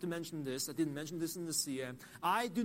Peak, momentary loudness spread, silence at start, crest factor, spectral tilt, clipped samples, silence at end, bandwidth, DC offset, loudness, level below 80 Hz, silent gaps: -20 dBFS; 6 LU; 0 s; 18 dB; -3.5 dB/octave; under 0.1%; 0 s; 16 kHz; under 0.1%; -38 LUFS; -74 dBFS; none